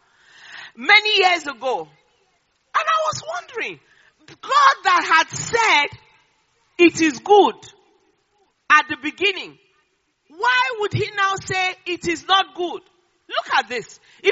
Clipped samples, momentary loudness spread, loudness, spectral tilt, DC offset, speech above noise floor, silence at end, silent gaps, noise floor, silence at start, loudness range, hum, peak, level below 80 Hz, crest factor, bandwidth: under 0.1%; 15 LU; -18 LUFS; -1 dB/octave; under 0.1%; 48 dB; 0 s; none; -67 dBFS; 0.5 s; 4 LU; none; 0 dBFS; -62 dBFS; 20 dB; 8 kHz